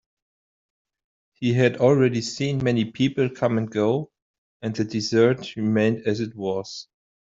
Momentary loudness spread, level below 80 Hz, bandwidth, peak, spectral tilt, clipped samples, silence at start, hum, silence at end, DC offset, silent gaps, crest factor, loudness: 11 LU; -60 dBFS; 7.8 kHz; -4 dBFS; -6.5 dB/octave; under 0.1%; 1.4 s; none; 0.4 s; under 0.1%; 4.22-4.60 s; 20 dB; -23 LUFS